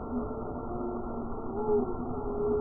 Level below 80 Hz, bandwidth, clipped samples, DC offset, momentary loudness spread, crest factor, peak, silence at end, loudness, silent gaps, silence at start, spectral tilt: -44 dBFS; 1.6 kHz; under 0.1%; under 0.1%; 8 LU; 14 dB; -18 dBFS; 0 s; -34 LUFS; none; 0 s; -14 dB/octave